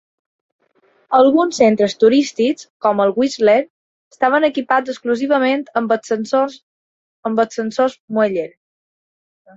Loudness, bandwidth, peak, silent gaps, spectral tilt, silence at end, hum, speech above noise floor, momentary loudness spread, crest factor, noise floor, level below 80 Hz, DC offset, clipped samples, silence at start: -16 LUFS; 8 kHz; 0 dBFS; 2.70-2.80 s, 3.70-4.11 s, 6.63-7.23 s, 8.00-8.08 s; -5 dB/octave; 1.1 s; none; 43 dB; 7 LU; 18 dB; -58 dBFS; -64 dBFS; under 0.1%; under 0.1%; 1.1 s